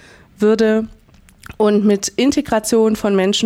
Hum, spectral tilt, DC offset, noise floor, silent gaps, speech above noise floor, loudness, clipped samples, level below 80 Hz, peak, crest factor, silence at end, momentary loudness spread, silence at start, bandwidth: none; -4.5 dB/octave; under 0.1%; -46 dBFS; none; 32 dB; -16 LUFS; under 0.1%; -46 dBFS; -4 dBFS; 12 dB; 0 s; 5 LU; 0.4 s; 16 kHz